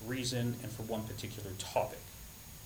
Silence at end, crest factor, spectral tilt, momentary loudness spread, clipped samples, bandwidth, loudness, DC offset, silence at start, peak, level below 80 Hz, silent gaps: 0 s; 20 dB; -4.5 dB/octave; 14 LU; under 0.1%; over 20 kHz; -38 LUFS; under 0.1%; 0 s; -18 dBFS; -58 dBFS; none